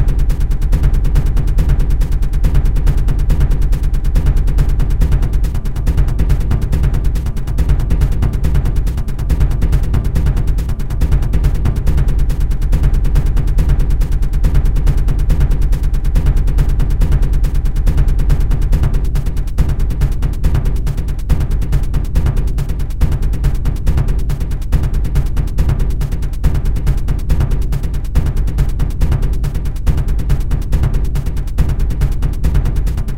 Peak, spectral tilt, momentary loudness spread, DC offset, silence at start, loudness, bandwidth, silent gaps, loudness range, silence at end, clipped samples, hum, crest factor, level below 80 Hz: 0 dBFS; -7.5 dB/octave; 4 LU; 5%; 0 s; -17 LUFS; 15.5 kHz; none; 2 LU; 0 s; under 0.1%; none; 12 dB; -14 dBFS